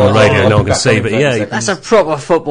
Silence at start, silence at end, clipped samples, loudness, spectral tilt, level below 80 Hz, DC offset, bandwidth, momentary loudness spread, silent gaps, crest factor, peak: 0 s; 0 s; under 0.1%; -11 LUFS; -5 dB/octave; -32 dBFS; under 0.1%; 10.5 kHz; 7 LU; none; 10 dB; 0 dBFS